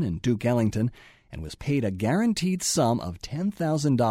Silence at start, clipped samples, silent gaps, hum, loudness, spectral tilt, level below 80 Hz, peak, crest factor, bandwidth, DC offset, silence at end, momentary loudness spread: 0 s; under 0.1%; none; none; -26 LUFS; -5.5 dB/octave; -48 dBFS; -12 dBFS; 14 dB; 16 kHz; under 0.1%; 0 s; 11 LU